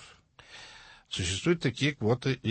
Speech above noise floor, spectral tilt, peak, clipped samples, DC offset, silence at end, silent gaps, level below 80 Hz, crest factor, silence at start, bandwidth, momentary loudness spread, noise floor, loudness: 26 dB; -5 dB/octave; -14 dBFS; under 0.1%; under 0.1%; 0 s; none; -58 dBFS; 18 dB; 0 s; 8.8 kHz; 21 LU; -55 dBFS; -29 LUFS